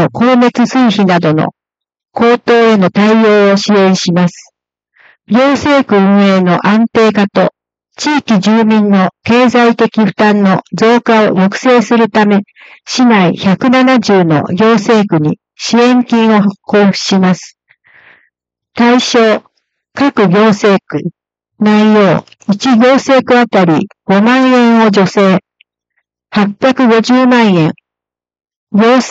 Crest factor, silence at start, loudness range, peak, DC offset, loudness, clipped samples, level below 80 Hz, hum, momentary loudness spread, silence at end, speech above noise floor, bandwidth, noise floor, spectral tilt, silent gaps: 10 dB; 0 s; 3 LU; 0 dBFS; under 0.1%; -9 LUFS; under 0.1%; -54 dBFS; none; 7 LU; 0 s; 77 dB; 8 kHz; -85 dBFS; -6 dB/octave; 28.56-28.67 s